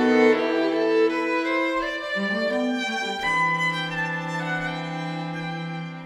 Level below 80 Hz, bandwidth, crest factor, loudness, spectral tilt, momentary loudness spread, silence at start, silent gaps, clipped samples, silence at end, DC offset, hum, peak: -58 dBFS; 12.5 kHz; 18 dB; -24 LUFS; -5.5 dB/octave; 9 LU; 0 s; none; under 0.1%; 0 s; under 0.1%; none; -6 dBFS